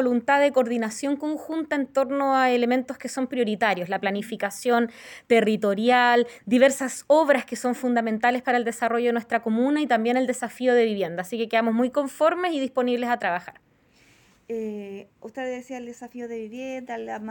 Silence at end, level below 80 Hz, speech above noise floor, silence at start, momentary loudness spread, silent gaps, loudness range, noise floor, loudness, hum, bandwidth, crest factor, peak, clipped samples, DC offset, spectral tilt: 0 s; -72 dBFS; 35 dB; 0 s; 14 LU; none; 10 LU; -59 dBFS; -23 LUFS; none; 17 kHz; 18 dB; -6 dBFS; under 0.1%; under 0.1%; -4.5 dB/octave